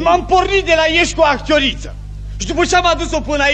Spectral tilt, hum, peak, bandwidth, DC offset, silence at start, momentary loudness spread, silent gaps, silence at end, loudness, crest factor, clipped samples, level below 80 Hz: -3.5 dB/octave; 50 Hz at -25 dBFS; 0 dBFS; 9 kHz; 0.2%; 0 s; 16 LU; none; 0 s; -14 LUFS; 14 dB; under 0.1%; -28 dBFS